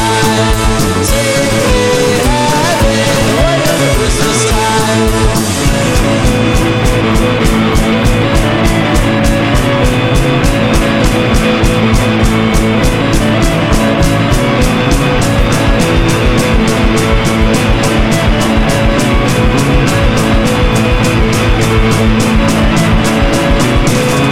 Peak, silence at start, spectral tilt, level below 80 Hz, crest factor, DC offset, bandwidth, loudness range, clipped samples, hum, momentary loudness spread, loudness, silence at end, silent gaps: 0 dBFS; 0 s; -5 dB/octave; -16 dBFS; 10 dB; 2%; 16.5 kHz; 0 LU; under 0.1%; none; 1 LU; -10 LUFS; 0 s; none